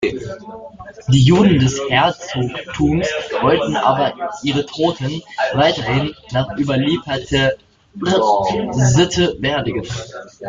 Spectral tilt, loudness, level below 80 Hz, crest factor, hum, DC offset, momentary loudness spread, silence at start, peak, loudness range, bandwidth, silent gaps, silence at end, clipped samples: -5.5 dB/octave; -17 LUFS; -42 dBFS; 16 dB; none; under 0.1%; 14 LU; 0 s; -2 dBFS; 3 LU; 7.6 kHz; none; 0 s; under 0.1%